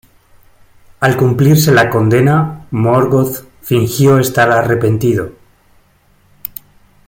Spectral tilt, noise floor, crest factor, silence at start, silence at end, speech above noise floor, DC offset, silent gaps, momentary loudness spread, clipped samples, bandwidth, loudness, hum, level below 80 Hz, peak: -6.5 dB/octave; -51 dBFS; 14 dB; 1 s; 1.75 s; 41 dB; under 0.1%; none; 17 LU; under 0.1%; 17 kHz; -12 LUFS; none; -44 dBFS; 0 dBFS